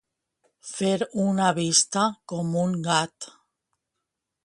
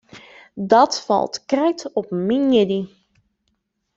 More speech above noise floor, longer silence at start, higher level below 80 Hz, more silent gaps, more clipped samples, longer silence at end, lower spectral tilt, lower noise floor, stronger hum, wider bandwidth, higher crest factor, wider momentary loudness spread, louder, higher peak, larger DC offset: first, 58 dB vs 53 dB; first, 0.65 s vs 0.15 s; second, -68 dBFS vs -62 dBFS; neither; neither; about the same, 1.15 s vs 1.1 s; second, -3.5 dB/octave vs -5 dB/octave; first, -83 dBFS vs -71 dBFS; neither; first, 11.5 kHz vs 7.8 kHz; about the same, 22 dB vs 18 dB; first, 18 LU vs 13 LU; second, -24 LUFS vs -19 LUFS; about the same, -4 dBFS vs -2 dBFS; neither